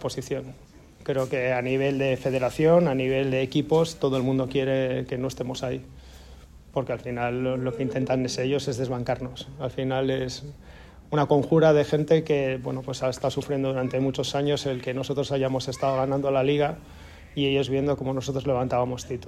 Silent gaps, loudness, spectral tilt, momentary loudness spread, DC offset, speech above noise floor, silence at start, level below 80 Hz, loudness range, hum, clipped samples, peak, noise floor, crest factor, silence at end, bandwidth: none; -25 LUFS; -6 dB/octave; 10 LU; under 0.1%; 22 dB; 0 s; -50 dBFS; 5 LU; none; under 0.1%; -8 dBFS; -47 dBFS; 18 dB; 0 s; 13.5 kHz